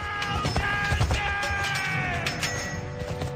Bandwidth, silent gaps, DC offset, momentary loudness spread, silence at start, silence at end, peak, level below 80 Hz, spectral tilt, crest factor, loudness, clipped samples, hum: 15.5 kHz; none; under 0.1%; 7 LU; 0 s; 0 s; -10 dBFS; -38 dBFS; -4 dB/octave; 18 dB; -27 LUFS; under 0.1%; none